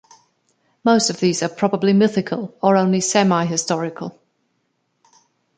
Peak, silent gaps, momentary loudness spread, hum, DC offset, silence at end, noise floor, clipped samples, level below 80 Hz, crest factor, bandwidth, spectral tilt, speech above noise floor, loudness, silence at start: -2 dBFS; none; 9 LU; none; under 0.1%; 1.45 s; -69 dBFS; under 0.1%; -64 dBFS; 18 dB; 9.4 kHz; -4.5 dB/octave; 52 dB; -18 LUFS; 0.85 s